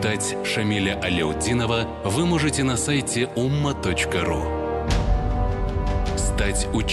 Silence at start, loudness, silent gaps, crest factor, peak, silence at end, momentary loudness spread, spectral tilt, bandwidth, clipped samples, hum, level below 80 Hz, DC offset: 0 s; -23 LUFS; none; 12 dB; -10 dBFS; 0 s; 4 LU; -4.5 dB/octave; 12.5 kHz; under 0.1%; none; -28 dBFS; under 0.1%